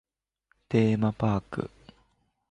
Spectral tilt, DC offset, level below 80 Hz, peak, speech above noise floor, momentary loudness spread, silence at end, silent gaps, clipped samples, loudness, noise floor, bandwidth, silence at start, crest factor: -8.5 dB/octave; under 0.1%; -54 dBFS; -12 dBFS; 47 dB; 12 LU; 0.85 s; none; under 0.1%; -27 LUFS; -72 dBFS; 8.4 kHz; 0.7 s; 18 dB